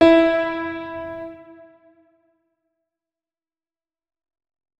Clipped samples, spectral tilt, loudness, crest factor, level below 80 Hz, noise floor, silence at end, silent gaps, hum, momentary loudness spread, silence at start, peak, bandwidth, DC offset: under 0.1%; -6 dB/octave; -21 LUFS; 22 dB; -54 dBFS; under -90 dBFS; 3.3 s; none; none; 22 LU; 0 s; -2 dBFS; 8 kHz; under 0.1%